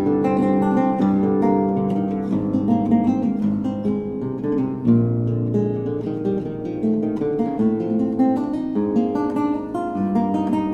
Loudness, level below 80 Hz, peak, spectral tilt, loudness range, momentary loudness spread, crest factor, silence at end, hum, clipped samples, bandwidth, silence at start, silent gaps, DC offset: -21 LUFS; -50 dBFS; -6 dBFS; -10 dB/octave; 3 LU; 6 LU; 14 dB; 0 s; none; under 0.1%; 6.8 kHz; 0 s; none; under 0.1%